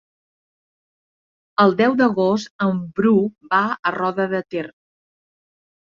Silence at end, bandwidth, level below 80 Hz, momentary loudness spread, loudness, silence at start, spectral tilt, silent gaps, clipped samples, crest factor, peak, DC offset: 1.25 s; 7.4 kHz; -64 dBFS; 10 LU; -19 LUFS; 1.6 s; -7 dB/octave; 2.50-2.59 s, 3.79-3.83 s; under 0.1%; 18 dB; -4 dBFS; under 0.1%